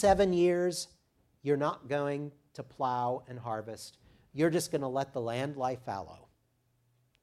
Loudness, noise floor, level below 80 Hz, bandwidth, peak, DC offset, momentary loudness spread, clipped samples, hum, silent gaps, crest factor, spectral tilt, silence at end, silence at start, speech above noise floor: -32 LUFS; -74 dBFS; -58 dBFS; 14.5 kHz; -12 dBFS; under 0.1%; 18 LU; under 0.1%; none; none; 20 dB; -5.5 dB/octave; 1.05 s; 0 s; 42 dB